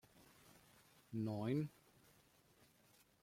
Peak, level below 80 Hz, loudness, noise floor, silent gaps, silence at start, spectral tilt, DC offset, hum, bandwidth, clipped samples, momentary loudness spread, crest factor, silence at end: -30 dBFS; -80 dBFS; -44 LUFS; -73 dBFS; none; 0.2 s; -8 dB/octave; under 0.1%; none; 16.5 kHz; under 0.1%; 25 LU; 20 dB; 1.5 s